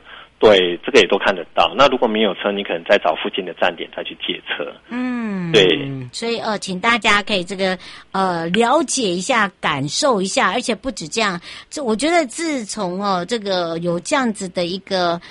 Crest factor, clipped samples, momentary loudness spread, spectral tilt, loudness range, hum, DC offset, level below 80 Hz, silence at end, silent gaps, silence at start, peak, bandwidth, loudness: 18 dB; under 0.1%; 11 LU; -3.5 dB/octave; 4 LU; none; under 0.1%; -50 dBFS; 0 s; none; 0.05 s; 0 dBFS; 11.5 kHz; -18 LUFS